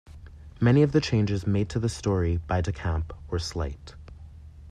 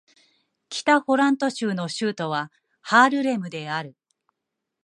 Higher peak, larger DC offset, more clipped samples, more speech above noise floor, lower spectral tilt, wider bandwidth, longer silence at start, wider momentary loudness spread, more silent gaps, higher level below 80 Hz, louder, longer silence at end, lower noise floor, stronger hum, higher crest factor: second, -8 dBFS vs -4 dBFS; neither; neither; second, 20 dB vs 61 dB; first, -7 dB/octave vs -4.5 dB/octave; about the same, 11 kHz vs 11 kHz; second, 0.1 s vs 0.7 s; first, 25 LU vs 15 LU; neither; first, -42 dBFS vs -76 dBFS; second, -26 LUFS vs -22 LUFS; second, 0 s vs 0.95 s; second, -45 dBFS vs -83 dBFS; neither; about the same, 18 dB vs 20 dB